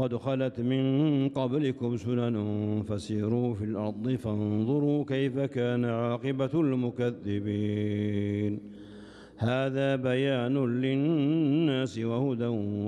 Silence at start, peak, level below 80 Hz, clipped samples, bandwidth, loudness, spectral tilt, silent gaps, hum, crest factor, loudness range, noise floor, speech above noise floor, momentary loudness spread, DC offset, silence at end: 0 s; -16 dBFS; -64 dBFS; under 0.1%; 10.5 kHz; -29 LUFS; -8 dB/octave; none; none; 14 dB; 3 LU; -48 dBFS; 20 dB; 6 LU; under 0.1%; 0 s